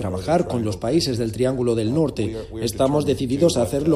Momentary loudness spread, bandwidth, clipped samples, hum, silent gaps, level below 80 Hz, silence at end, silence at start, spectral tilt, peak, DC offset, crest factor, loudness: 7 LU; 15 kHz; under 0.1%; none; none; -42 dBFS; 0 s; 0 s; -6 dB/octave; -4 dBFS; under 0.1%; 16 dB; -21 LUFS